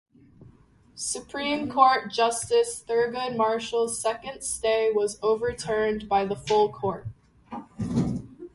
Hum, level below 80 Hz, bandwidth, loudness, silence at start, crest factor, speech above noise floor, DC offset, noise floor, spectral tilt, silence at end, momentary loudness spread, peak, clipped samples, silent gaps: none; -54 dBFS; 11.5 kHz; -26 LUFS; 0.4 s; 22 dB; 31 dB; under 0.1%; -56 dBFS; -4 dB/octave; 0.05 s; 11 LU; -6 dBFS; under 0.1%; none